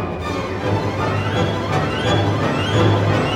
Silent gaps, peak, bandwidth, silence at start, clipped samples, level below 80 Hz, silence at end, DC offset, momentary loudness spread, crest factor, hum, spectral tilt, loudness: none; -4 dBFS; 11 kHz; 0 s; under 0.1%; -38 dBFS; 0 s; under 0.1%; 7 LU; 14 dB; none; -6.5 dB/octave; -19 LUFS